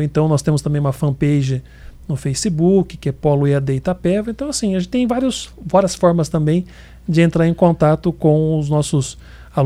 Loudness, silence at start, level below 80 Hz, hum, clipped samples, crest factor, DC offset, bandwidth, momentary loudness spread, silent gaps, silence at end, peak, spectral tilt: -17 LUFS; 0 s; -40 dBFS; none; under 0.1%; 16 dB; under 0.1%; 13.5 kHz; 9 LU; none; 0 s; -2 dBFS; -6.5 dB/octave